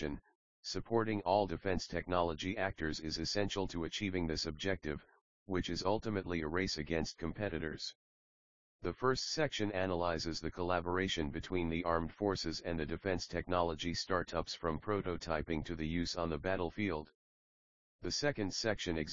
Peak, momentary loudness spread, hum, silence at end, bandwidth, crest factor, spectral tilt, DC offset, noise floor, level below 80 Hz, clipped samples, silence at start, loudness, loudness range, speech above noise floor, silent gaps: -16 dBFS; 6 LU; none; 0 s; 7.4 kHz; 20 dB; -4 dB/octave; 0.2%; under -90 dBFS; -54 dBFS; under 0.1%; 0 s; -37 LUFS; 3 LU; over 53 dB; 0.35-0.63 s, 5.21-5.46 s, 7.95-8.79 s, 17.15-17.99 s